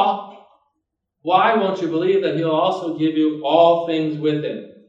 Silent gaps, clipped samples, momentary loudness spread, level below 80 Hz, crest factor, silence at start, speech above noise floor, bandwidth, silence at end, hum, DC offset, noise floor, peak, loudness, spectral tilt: none; under 0.1%; 8 LU; -74 dBFS; 18 dB; 0 s; 59 dB; 7.6 kHz; 0.15 s; none; under 0.1%; -76 dBFS; 0 dBFS; -19 LUFS; -7 dB/octave